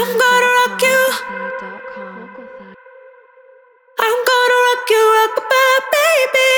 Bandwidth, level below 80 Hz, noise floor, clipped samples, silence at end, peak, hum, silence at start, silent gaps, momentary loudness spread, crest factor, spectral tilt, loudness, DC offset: over 20 kHz; -68 dBFS; -48 dBFS; under 0.1%; 0 s; -2 dBFS; none; 0 s; none; 19 LU; 14 dB; -1 dB/octave; -13 LUFS; under 0.1%